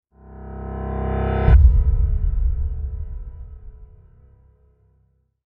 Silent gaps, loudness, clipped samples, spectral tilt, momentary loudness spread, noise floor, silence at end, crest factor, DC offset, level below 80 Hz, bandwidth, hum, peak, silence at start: none; -21 LUFS; under 0.1%; -11 dB/octave; 24 LU; -63 dBFS; 1.6 s; 18 dB; under 0.1%; -22 dBFS; 3.7 kHz; none; -2 dBFS; 0.3 s